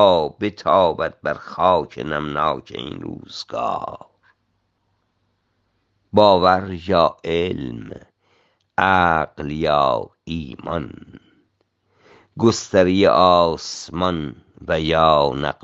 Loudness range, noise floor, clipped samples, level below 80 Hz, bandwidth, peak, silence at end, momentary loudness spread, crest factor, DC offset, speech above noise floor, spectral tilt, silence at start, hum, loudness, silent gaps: 9 LU; -69 dBFS; under 0.1%; -50 dBFS; 8 kHz; 0 dBFS; 0.1 s; 16 LU; 20 dB; under 0.1%; 50 dB; -5.5 dB/octave; 0 s; none; -19 LUFS; none